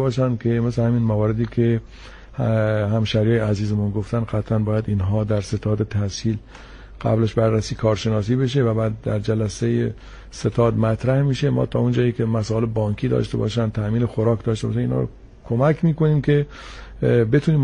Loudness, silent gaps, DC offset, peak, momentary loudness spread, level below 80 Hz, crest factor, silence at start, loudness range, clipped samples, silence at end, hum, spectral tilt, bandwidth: -21 LUFS; none; under 0.1%; -4 dBFS; 6 LU; -40 dBFS; 16 dB; 0 s; 2 LU; under 0.1%; 0 s; none; -7.5 dB/octave; 10 kHz